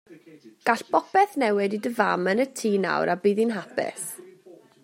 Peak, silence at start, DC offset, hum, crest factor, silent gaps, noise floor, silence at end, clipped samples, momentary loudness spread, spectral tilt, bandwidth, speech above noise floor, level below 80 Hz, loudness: -4 dBFS; 0.1 s; under 0.1%; none; 20 dB; none; -51 dBFS; 0.3 s; under 0.1%; 8 LU; -5 dB/octave; 16 kHz; 27 dB; -76 dBFS; -24 LUFS